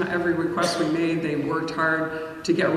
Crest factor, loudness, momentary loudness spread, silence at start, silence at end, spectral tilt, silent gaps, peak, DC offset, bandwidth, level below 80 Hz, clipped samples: 14 dB; -24 LUFS; 3 LU; 0 s; 0 s; -5 dB/octave; none; -10 dBFS; under 0.1%; 13 kHz; -58 dBFS; under 0.1%